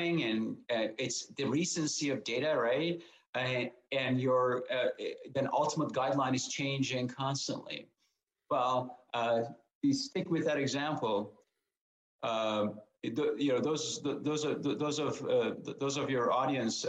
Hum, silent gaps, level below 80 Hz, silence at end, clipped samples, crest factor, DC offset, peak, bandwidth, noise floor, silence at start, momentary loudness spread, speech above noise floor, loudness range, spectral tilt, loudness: none; 3.29-3.33 s, 9.75-9.81 s, 11.77-12.19 s; -78 dBFS; 0 s; under 0.1%; 14 dB; under 0.1%; -18 dBFS; 9.6 kHz; -80 dBFS; 0 s; 7 LU; 47 dB; 2 LU; -4.5 dB/octave; -33 LUFS